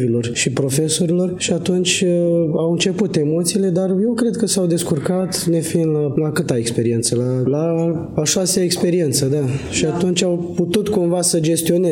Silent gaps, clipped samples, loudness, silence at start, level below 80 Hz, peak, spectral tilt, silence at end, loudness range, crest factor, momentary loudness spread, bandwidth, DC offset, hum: none; under 0.1%; -17 LUFS; 0 s; -52 dBFS; -2 dBFS; -5 dB/octave; 0 s; 1 LU; 14 dB; 3 LU; 17.5 kHz; under 0.1%; none